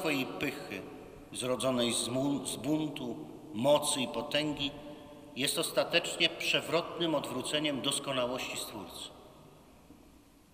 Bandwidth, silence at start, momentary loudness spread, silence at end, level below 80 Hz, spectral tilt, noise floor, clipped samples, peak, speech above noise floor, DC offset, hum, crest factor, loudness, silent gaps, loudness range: 15.5 kHz; 0 s; 15 LU; 0.35 s; -64 dBFS; -3 dB/octave; -59 dBFS; under 0.1%; -12 dBFS; 26 dB; under 0.1%; none; 22 dB; -32 LUFS; none; 4 LU